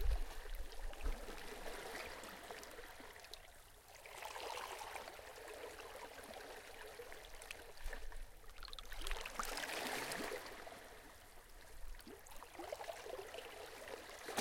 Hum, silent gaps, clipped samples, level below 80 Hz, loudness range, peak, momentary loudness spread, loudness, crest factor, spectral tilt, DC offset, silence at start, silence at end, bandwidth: none; none; under 0.1%; -52 dBFS; 6 LU; -24 dBFS; 14 LU; -50 LUFS; 24 dB; -2.5 dB/octave; under 0.1%; 0 s; 0 s; 16.5 kHz